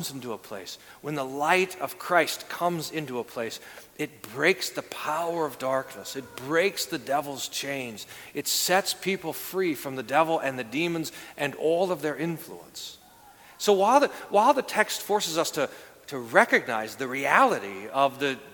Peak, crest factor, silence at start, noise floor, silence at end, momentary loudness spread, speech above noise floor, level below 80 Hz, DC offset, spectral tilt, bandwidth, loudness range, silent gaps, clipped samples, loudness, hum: -2 dBFS; 24 dB; 0 s; -52 dBFS; 0 s; 15 LU; 25 dB; -70 dBFS; under 0.1%; -3 dB/octave; 19 kHz; 5 LU; none; under 0.1%; -26 LUFS; none